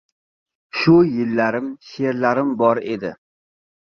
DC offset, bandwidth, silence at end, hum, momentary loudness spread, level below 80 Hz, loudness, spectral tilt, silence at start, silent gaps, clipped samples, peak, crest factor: under 0.1%; 6.6 kHz; 0.75 s; none; 14 LU; -58 dBFS; -19 LUFS; -8 dB/octave; 0.75 s; none; under 0.1%; -2 dBFS; 18 dB